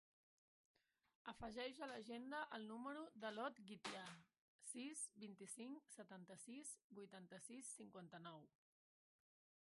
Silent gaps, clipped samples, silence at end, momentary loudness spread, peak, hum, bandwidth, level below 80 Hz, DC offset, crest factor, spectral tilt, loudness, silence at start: 4.39-4.59 s, 6.84-6.90 s; under 0.1%; 1.25 s; 10 LU; -36 dBFS; none; 11.5 kHz; -84 dBFS; under 0.1%; 20 dB; -3 dB/octave; -55 LUFS; 1.25 s